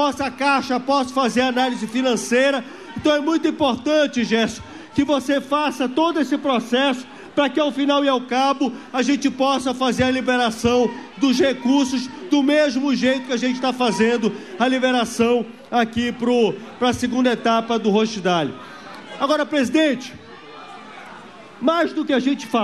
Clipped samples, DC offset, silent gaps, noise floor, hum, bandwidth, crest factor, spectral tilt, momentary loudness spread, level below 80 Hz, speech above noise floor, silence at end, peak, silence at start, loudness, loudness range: under 0.1%; 0.2%; none; -40 dBFS; none; 13 kHz; 14 dB; -4 dB/octave; 8 LU; -54 dBFS; 21 dB; 0 s; -6 dBFS; 0 s; -20 LUFS; 3 LU